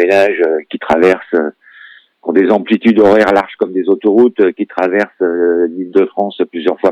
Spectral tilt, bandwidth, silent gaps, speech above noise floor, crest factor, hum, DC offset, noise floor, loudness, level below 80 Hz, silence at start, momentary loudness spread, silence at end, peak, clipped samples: -6.5 dB/octave; 9.2 kHz; none; 28 dB; 12 dB; none; under 0.1%; -40 dBFS; -12 LUFS; -54 dBFS; 0 s; 8 LU; 0 s; 0 dBFS; under 0.1%